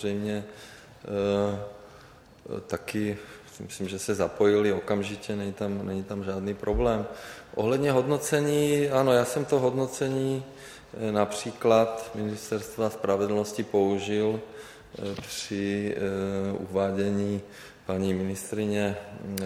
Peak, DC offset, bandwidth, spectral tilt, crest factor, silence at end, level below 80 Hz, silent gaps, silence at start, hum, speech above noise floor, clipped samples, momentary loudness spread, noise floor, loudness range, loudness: -8 dBFS; under 0.1%; 16.5 kHz; -5.5 dB/octave; 20 dB; 0 s; -50 dBFS; none; 0 s; none; 24 dB; under 0.1%; 16 LU; -52 dBFS; 5 LU; -28 LUFS